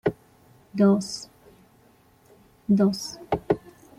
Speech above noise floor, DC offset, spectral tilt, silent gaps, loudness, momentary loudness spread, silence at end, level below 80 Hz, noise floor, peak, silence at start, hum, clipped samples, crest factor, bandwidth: 36 dB; under 0.1%; -6.5 dB/octave; none; -25 LUFS; 16 LU; 0.4 s; -58 dBFS; -58 dBFS; -8 dBFS; 0.05 s; none; under 0.1%; 18 dB; 13.5 kHz